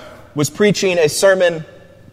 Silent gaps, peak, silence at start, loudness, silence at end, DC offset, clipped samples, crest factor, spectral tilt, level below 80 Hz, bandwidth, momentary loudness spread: none; 0 dBFS; 0 s; -15 LUFS; 0.45 s; under 0.1%; under 0.1%; 16 dB; -4 dB/octave; -54 dBFS; 16 kHz; 12 LU